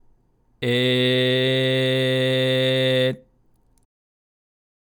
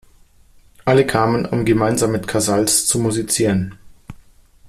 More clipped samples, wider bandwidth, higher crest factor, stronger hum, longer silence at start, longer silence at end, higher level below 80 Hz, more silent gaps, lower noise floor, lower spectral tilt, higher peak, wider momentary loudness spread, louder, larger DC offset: neither; first, 19 kHz vs 15 kHz; about the same, 12 dB vs 16 dB; neither; second, 0.6 s vs 0.85 s; first, 1.65 s vs 0.55 s; second, -64 dBFS vs -44 dBFS; neither; first, -60 dBFS vs -49 dBFS; first, -6 dB/octave vs -4.5 dB/octave; second, -10 dBFS vs -2 dBFS; about the same, 5 LU vs 5 LU; second, -20 LUFS vs -17 LUFS; neither